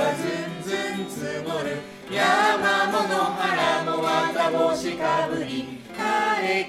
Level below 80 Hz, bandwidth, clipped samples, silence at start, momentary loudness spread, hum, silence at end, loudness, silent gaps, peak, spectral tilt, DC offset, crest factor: -62 dBFS; 16 kHz; under 0.1%; 0 s; 10 LU; none; 0 s; -24 LUFS; none; -6 dBFS; -4 dB/octave; under 0.1%; 16 dB